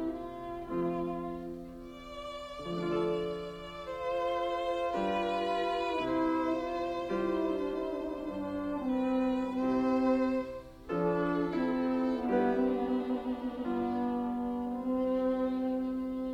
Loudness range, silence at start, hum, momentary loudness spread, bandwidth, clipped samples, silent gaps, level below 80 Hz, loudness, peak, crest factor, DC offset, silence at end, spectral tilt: 5 LU; 0 s; none; 11 LU; 9.2 kHz; under 0.1%; none; -56 dBFS; -33 LUFS; -18 dBFS; 16 dB; under 0.1%; 0 s; -7 dB/octave